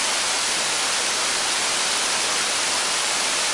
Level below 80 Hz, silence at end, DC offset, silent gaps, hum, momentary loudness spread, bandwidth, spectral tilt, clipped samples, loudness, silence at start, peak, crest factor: -60 dBFS; 0 s; under 0.1%; none; none; 0 LU; 11.5 kHz; 1.5 dB/octave; under 0.1%; -20 LUFS; 0 s; -8 dBFS; 14 dB